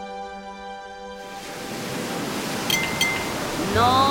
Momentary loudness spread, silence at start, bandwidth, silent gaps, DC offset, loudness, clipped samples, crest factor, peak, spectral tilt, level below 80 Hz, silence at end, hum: 16 LU; 0 s; 17.5 kHz; none; under 0.1%; -24 LUFS; under 0.1%; 18 dB; -6 dBFS; -3 dB/octave; -48 dBFS; 0 s; none